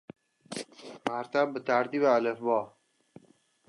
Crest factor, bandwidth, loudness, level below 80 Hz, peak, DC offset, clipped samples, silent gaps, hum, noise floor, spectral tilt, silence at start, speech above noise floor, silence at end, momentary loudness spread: 22 dB; 11.5 kHz; -29 LUFS; -82 dBFS; -10 dBFS; under 0.1%; under 0.1%; none; none; -64 dBFS; -5 dB/octave; 0.5 s; 36 dB; 1 s; 16 LU